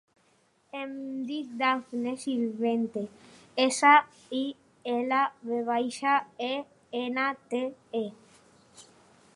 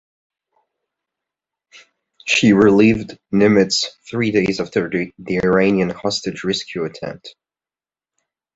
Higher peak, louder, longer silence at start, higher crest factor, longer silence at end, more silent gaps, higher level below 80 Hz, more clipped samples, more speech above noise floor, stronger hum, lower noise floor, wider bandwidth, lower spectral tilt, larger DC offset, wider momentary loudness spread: second, -6 dBFS vs -2 dBFS; second, -29 LUFS vs -17 LUFS; second, 0.75 s vs 2.25 s; about the same, 22 dB vs 18 dB; second, 0.55 s vs 1.25 s; neither; second, -80 dBFS vs -50 dBFS; neither; second, 39 dB vs over 73 dB; neither; second, -67 dBFS vs under -90 dBFS; first, 11.5 kHz vs 8 kHz; second, -3 dB/octave vs -5 dB/octave; neither; about the same, 15 LU vs 14 LU